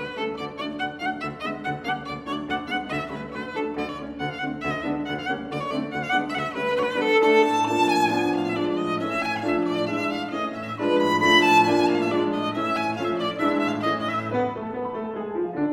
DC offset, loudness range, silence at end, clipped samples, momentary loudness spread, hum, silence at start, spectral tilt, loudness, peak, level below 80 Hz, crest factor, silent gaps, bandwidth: under 0.1%; 8 LU; 0 s; under 0.1%; 12 LU; none; 0 s; -5 dB/octave; -24 LUFS; -4 dBFS; -58 dBFS; 20 dB; none; 16 kHz